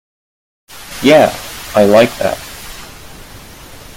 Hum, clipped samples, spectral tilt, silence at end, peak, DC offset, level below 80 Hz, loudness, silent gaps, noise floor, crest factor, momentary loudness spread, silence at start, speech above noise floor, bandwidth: none; under 0.1%; -4.5 dB/octave; 0.2 s; 0 dBFS; under 0.1%; -42 dBFS; -11 LUFS; none; -34 dBFS; 14 dB; 26 LU; 0.75 s; 25 dB; 17 kHz